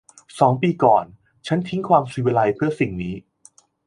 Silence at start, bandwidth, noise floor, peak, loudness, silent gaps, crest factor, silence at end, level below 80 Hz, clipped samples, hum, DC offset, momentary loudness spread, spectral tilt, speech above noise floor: 0.35 s; 11 kHz; -54 dBFS; -2 dBFS; -20 LUFS; none; 20 dB; 0.7 s; -52 dBFS; under 0.1%; none; under 0.1%; 18 LU; -7.5 dB/octave; 34 dB